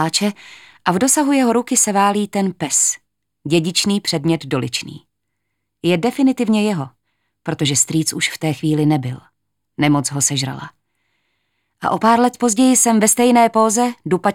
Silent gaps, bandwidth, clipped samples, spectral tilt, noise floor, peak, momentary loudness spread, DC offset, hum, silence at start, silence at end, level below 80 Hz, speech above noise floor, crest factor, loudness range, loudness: none; 17.5 kHz; under 0.1%; -4 dB/octave; -76 dBFS; 0 dBFS; 13 LU; under 0.1%; 50 Hz at -40 dBFS; 0 s; 0 s; -62 dBFS; 59 dB; 18 dB; 5 LU; -16 LUFS